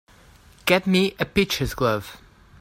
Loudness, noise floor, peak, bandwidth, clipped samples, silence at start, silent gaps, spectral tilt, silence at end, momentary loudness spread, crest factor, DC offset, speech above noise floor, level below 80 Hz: -22 LUFS; -51 dBFS; -2 dBFS; 16 kHz; under 0.1%; 0.65 s; none; -5 dB/octave; 0.45 s; 10 LU; 22 dB; under 0.1%; 29 dB; -44 dBFS